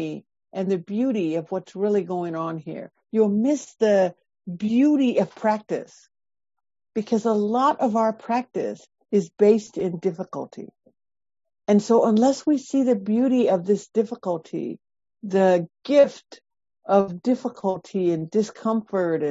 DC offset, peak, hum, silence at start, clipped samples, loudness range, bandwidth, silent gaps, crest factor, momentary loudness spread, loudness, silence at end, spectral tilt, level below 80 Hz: under 0.1%; -6 dBFS; none; 0 s; under 0.1%; 3 LU; 8 kHz; none; 18 dB; 14 LU; -23 LUFS; 0 s; -7 dB/octave; -70 dBFS